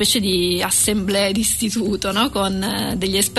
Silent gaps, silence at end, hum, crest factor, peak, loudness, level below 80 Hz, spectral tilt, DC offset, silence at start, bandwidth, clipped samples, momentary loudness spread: none; 0 s; none; 14 dB; -6 dBFS; -18 LUFS; -40 dBFS; -3 dB/octave; 0.2%; 0 s; 12.5 kHz; under 0.1%; 5 LU